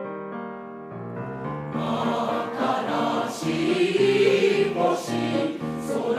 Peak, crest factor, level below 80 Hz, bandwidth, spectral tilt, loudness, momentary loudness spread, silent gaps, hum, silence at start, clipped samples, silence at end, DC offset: -8 dBFS; 16 dB; -62 dBFS; 14.5 kHz; -5.5 dB/octave; -24 LUFS; 15 LU; none; none; 0 s; under 0.1%; 0 s; under 0.1%